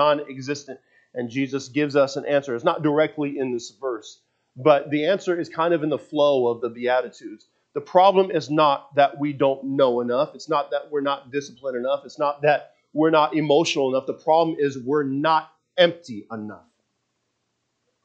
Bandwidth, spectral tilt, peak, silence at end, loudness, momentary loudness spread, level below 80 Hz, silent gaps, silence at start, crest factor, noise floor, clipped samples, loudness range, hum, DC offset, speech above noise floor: 8 kHz; -5.5 dB/octave; -2 dBFS; 1.45 s; -22 LUFS; 13 LU; -76 dBFS; none; 0 s; 20 dB; -75 dBFS; under 0.1%; 3 LU; none; under 0.1%; 53 dB